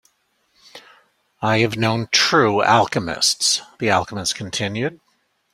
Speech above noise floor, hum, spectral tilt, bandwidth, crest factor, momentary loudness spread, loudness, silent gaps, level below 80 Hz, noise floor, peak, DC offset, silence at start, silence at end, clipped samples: 47 dB; none; -3 dB/octave; 16 kHz; 20 dB; 9 LU; -18 LUFS; none; -56 dBFS; -66 dBFS; -2 dBFS; under 0.1%; 0.75 s; 0.6 s; under 0.1%